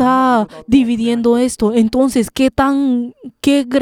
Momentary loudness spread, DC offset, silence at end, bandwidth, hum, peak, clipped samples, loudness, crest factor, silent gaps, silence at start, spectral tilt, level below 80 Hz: 4 LU; under 0.1%; 0 s; 15.5 kHz; none; 0 dBFS; under 0.1%; -14 LUFS; 14 dB; none; 0 s; -5 dB/octave; -40 dBFS